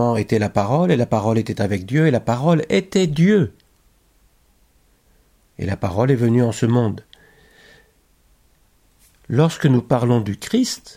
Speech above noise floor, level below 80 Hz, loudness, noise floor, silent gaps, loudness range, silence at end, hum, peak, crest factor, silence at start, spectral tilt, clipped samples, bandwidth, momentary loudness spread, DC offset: 40 dB; -52 dBFS; -19 LUFS; -57 dBFS; none; 5 LU; 0.05 s; none; -4 dBFS; 16 dB; 0 s; -7 dB/octave; under 0.1%; 15 kHz; 7 LU; under 0.1%